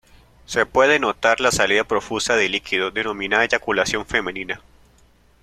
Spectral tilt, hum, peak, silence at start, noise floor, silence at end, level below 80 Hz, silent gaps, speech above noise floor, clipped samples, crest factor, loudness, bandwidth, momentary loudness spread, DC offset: -2.5 dB/octave; none; 0 dBFS; 0.5 s; -55 dBFS; 0.85 s; -50 dBFS; none; 35 dB; under 0.1%; 20 dB; -19 LUFS; 14.5 kHz; 8 LU; under 0.1%